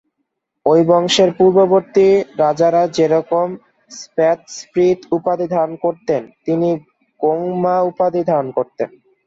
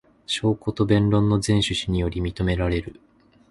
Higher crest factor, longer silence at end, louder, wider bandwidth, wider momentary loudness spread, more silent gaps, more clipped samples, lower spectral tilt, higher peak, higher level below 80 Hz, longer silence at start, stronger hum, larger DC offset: about the same, 14 dB vs 18 dB; second, 0.4 s vs 0.6 s; first, -16 LUFS vs -23 LUFS; second, 8 kHz vs 11.5 kHz; first, 11 LU vs 8 LU; neither; neither; about the same, -5.5 dB/octave vs -6 dB/octave; about the same, -2 dBFS vs -4 dBFS; second, -60 dBFS vs -36 dBFS; first, 0.65 s vs 0.3 s; neither; neither